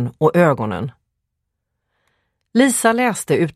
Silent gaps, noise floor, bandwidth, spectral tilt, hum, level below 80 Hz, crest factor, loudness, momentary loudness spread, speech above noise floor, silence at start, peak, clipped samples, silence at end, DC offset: none; -76 dBFS; 15 kHz; -5 dB/octave; none; -58 dBFS; 18 dB; -17 LUFS; 11 LU; 60 dB; 0 s; 0 dBFS; under 0.1%; 0.05 s; under 0.1%